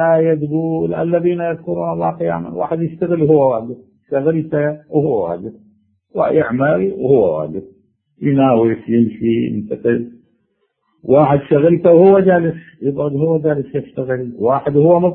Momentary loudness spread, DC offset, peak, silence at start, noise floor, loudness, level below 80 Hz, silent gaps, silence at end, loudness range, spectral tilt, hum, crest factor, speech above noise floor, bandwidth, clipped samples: 11 LU; under 0.1%; 0 dBFS; 0 s; -66 dBFS; -15 LUFS; -52 dBFS; none; 0 s; 4 LU; -12 dB/octave; none; 16 dB; 51 dB; 3.8 kHz; under 0.1%